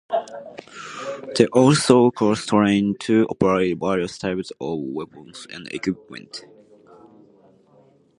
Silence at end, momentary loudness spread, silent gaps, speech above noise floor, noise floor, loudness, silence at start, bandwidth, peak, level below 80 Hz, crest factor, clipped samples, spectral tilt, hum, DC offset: 1.8 s; 21 LU; none; 34 dB; -55 dBFS; -20 LUFS; 0.1 s; 11.5 kHz; 0 dBFS; -56 dBFS; 22 dB; under 0.1%; -5.5 dB/octave; none; under 0.1%